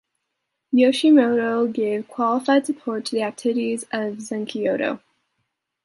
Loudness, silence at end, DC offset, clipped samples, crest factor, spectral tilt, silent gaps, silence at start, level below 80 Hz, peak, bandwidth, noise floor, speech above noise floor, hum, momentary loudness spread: -21 LUFS; 0.9 s; under 0.1%; under 0.1%; 18 dB; -4.5 dB/octave; none; 0.7 s; -74 dBFS; -4 dBFS; 11.5 kHz; -78 dBFS; 58 dB; none; 11 LU